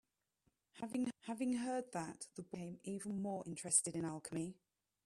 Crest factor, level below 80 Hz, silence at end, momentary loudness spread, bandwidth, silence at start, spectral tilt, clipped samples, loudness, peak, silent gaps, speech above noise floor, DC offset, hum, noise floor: 24 dB; -80 dBFS; 0.5 s; 15 LU; 14 kHz; 0.75 s; -4 dB/octave; under 0.1%; -42 LUFS; -18 dBFS; none; 41 dB; under 0.1%; none; -83 dBFS